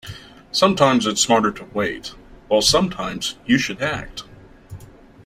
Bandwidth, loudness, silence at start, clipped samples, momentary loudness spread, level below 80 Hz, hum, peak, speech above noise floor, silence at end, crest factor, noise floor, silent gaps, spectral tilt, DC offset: 16 kHz; -19 LUFS; 0.05 s; under 0.1%; 19 LU; -46 dBFS; none; -2 dBFS; 23 dB; 0.4 s; 20 dB; -42 dBFS; none; -3.5 dB/octave; under 0.1%